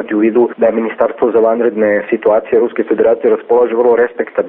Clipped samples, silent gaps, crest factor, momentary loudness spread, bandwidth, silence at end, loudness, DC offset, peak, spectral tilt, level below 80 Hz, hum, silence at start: under 0.1%; none; 12 dB; 3 LU; 3.6 kHz; 0 s; -12 LUFS; under 0.1%; 0 dBFS; -5.5 dB/octave; -54 dBFS; none; 0 s